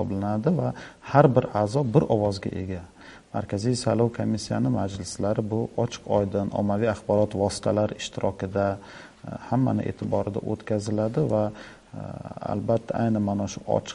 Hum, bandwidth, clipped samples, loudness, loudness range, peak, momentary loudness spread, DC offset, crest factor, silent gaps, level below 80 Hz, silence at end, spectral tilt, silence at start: none; 11.5 kHz; under 0.1%; -26 LUFS; 3 LU; -2 dBFS; 13 LU; under 0.1%; 24 dB; none; -54 dBFS; 0 s; -7 dB/octave; 0 s